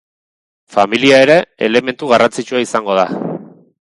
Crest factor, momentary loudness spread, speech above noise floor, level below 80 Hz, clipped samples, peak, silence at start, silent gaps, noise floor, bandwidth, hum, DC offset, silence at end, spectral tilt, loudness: 14 dB; 11 LU; over 78 dB; -58 dBFS; under 0.1%; 0 dBFS; 0.7 s; none; under -90 dBFS; 11.5 kHz; none; under 0.1%; 0.5 s; -4.5 dB/octave; -13 LUFS